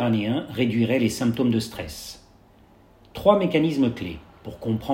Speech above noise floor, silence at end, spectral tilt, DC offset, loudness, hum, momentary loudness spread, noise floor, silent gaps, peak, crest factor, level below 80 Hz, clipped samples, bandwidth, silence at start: 31 dB; 0 s; -6.5 dB/octave; under 0.1%; -23 LUFS; none; 17 LU; -53 dBFS; none; -4 dBFS; 20 dB; -52 dBFS; under 0.1%; 16.5 kHz; 0 s